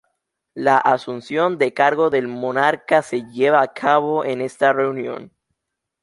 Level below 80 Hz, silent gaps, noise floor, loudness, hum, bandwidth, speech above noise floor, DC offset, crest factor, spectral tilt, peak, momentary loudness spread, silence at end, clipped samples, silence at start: -68 dBFS; none; -79 dBFS; -19 LUFS; none; 11.5 kHz; 61 dB; under 0.1%; 18 dB; -5.5 dB/octave; -2 dBFS; 9 LU; 0.75 s; under 0.1%; 0.55 s